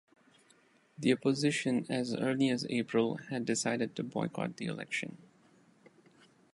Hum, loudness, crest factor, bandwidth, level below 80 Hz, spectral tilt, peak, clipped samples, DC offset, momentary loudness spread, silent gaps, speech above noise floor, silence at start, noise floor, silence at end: none; -33 LUFS; 20 dB; 11.5 kHz; -78 dBFS; -5 dB/octave; -14 dBFS; under 0.1%; under 0.1%; 7 LU; none; 34 dB; 1 s; -66 dBFS; 1.4 s